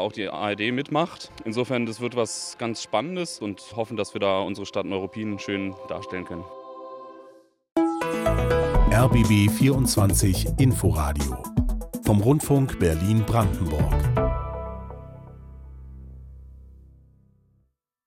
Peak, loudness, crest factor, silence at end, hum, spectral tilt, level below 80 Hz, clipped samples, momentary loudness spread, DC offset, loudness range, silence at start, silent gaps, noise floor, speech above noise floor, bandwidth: -8 dBFS; -24 LUFS; 16 dB; 1.4 s; none; -6 dB/octave; -34 dBFS; under 0.1%; 20 LU; under 0.1%; 10 LU; 0 s; 7.72-7.76 s; -69 dBFS; 46 dB; 16.5 kHz